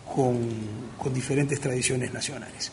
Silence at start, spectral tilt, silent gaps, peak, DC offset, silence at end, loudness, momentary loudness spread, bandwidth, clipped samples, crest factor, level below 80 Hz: 0 s; -5 dB/octave; none; -10 dBFS; under 0.1%; 0 s; -28 LUFS; 8 LU; 11 kHz; under 0.1%; 18 dB; -56 dBFS